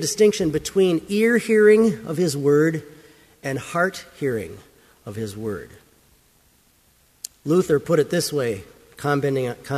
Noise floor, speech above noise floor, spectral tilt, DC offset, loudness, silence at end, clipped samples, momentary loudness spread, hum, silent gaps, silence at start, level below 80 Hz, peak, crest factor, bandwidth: -59 dBFS; 38 dB; -5.5 dB/octave; under 0.1%; -21 LUFS; 0 s; under 0.1%; 16 LU; none; none; 0 s; -56 dBFS; -4 dBFS; 16 dB; 15 kHz